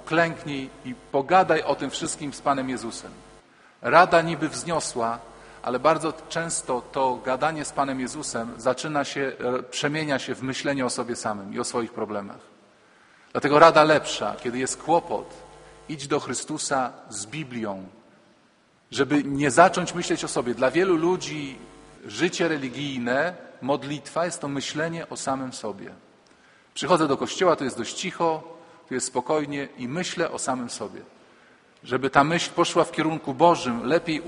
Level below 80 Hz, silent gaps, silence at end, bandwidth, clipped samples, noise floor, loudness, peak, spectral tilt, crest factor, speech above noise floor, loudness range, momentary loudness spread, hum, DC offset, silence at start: -60 dBFS; none; 0 s; 10.5 kHz; under 0.1%; -61 dBFS; -24 LUFS; 0 dBFS; -4 dB/octave; 24 dB; 36 dB; 7 LU; 14 LU; none; under 0.1%; 0 s